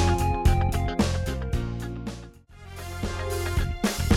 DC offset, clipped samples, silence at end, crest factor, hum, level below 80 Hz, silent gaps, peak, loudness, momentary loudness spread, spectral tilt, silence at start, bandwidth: under 0.1%; under 0.1%; 0 s; 18 dB; none; -30 dBFS; none; -8 dBFS; -27 LUFS; 15 LU; -5.5 dB/octave; 0 s; 16.5 kHz